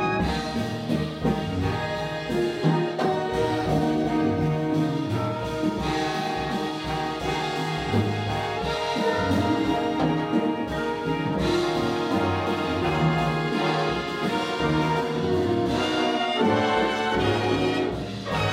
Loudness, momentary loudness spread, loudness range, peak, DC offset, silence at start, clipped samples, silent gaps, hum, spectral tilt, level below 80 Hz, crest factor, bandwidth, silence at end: -25 LUFS; 4 LU; 3 LU; -10 dBFS; under 0.1%; 0 s; under 0.1%; none; none; -6 dB/octave; -44 dBFS; 16 dB; 16 kHz; 0 s